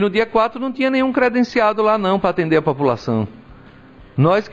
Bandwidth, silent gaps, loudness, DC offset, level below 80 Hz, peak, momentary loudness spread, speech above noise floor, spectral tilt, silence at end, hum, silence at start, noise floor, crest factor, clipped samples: 7.8 kHz; none; -17 LUFS; 0.1%; -48 dBFS; -4 dBFS; 5 LU; 26 dB; -7.5 dB/octave; 0 s; none; 0 s; -43 dBFS; 14 dB; under 0.1%